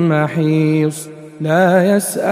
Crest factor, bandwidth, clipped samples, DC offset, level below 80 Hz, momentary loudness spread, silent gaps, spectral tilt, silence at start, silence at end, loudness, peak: 14 dB; 15.5 kHz; under 0.1%; under 0.1%; -60 dBFS; 13 LU; none; -6.5 dB/octave; 0 s; 0 s; -15 LUFS; 0 dBFS